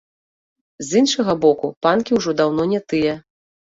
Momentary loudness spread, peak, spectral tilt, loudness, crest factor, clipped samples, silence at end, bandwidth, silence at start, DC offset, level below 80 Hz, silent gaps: 5 LU; -2 dBFS; -4.5 dB/octave; -18 LUFS; 18 dB; under 0.1%; 0.5 s; 8 kHz; 0.8 s; under 0.1%; -56 dBFS; 1.76-1.81 s